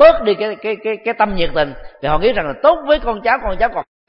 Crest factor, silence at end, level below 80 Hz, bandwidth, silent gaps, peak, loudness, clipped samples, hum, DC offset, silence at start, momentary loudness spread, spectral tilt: 16 dB; 0.25 s; -32 dBFS; 5.6 kHz; none; 0 dBFS; -17 LUFS; under 0.1%; none; under 0.1%; 0 s; 7 LU; -8 dB/octave